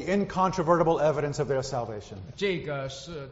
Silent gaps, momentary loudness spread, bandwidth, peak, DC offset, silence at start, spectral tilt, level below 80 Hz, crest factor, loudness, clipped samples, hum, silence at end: none; 14 LU; 8 kHz; -8 dBFS; under 0.1%; 0 s; -5.5 dB/octave; -52 dBFS; 18 dB; -27 LUFS; under 0.1%; none; 0 s